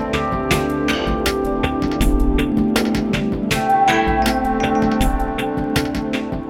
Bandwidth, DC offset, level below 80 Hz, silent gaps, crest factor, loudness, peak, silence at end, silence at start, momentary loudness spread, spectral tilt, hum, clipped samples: over 20 kHz; under 0.1%; -26 dBFS; none; 16 dB; -19 LUFS; -2 dBFS; 0 s; 0 s; 5 LU; -5.5 dB/octave; none; under 0.1%